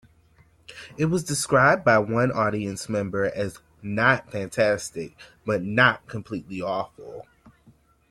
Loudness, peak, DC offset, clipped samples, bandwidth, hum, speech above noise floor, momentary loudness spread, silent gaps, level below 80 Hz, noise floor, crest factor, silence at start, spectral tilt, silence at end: -23 LUFS; -4 dBFS; under 0.1%; under 0.1%; 14.5 kHz; none; 34 dB; 20 LU; none; -56 dBFS; -58 dBFS; 22 dB; 0.7 s; -5 dB/octave; 0.9 s